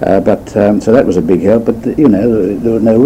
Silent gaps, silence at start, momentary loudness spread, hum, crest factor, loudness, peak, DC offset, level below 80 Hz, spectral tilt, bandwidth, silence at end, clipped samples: none; 0 s; 4 LU; none; 10 dB; -11 LUFS; 0 dBFS; under 0.1%; -36 dBFS; -8.5 dB/octave; 15 kHz; 0 s; 2%